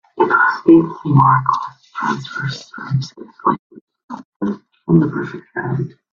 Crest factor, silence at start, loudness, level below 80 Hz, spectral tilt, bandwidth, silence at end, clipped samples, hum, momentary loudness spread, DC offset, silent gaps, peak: 18 dB; 0.15 s; -17 LUFS; -54 dBFS; -8 dB/octave; 7.2 kHz; 0.25 s; under 0.1%; none; 17 LU; under 0.1%; 3.59-3.70 s, 3.81-3.87 s, 4.04-4.08 s, 4.25-4.40 s; 0 dBFS